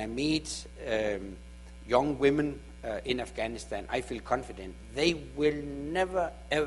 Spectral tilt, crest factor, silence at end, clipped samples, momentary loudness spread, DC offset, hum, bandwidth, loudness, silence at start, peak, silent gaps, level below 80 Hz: -4.5 dB/octave; 20 dB; 0 s; under 0.1%; 14 LU; under 0.1%; 60 Hz at -50 dBFS; 11.5 kHz; -31 LUFS; 0 s; -10 dBFS; none; -48 dBFS